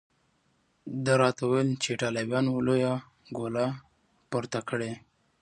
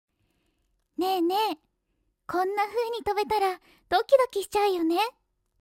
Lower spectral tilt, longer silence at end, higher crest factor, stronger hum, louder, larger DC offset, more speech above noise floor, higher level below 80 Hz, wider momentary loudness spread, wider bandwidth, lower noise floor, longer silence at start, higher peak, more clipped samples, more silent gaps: first, -5.5 dB/octave vs -3 dB/octave; about the same, 0.45 s vs 0.5 s; about the same, 22 dB vs 20 dB; neither; second, -29 LUFS vs -26 LUFS; neither; second, 43 dB vs 49 dB; about the same, -66 dBFS vs -62 dBFS; first, 14 LU vs 9 LU; second, 11 kHz vs 16 kHz; second, -70 dBFS vs -75 dBFS; second, 0.85 s vs 1 s; about the same, -8 dBFS vs -8 dBFS; neither; neither